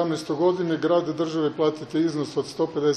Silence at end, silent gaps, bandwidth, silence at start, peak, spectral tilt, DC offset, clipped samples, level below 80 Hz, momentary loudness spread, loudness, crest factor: 0 s; none; 11 kHz; 0 s; -10 dBFS; -6 dB/octave; under 0.1%; under 0.1%; -66 dBFS; 4 LU; -24 LUFS; 14 dB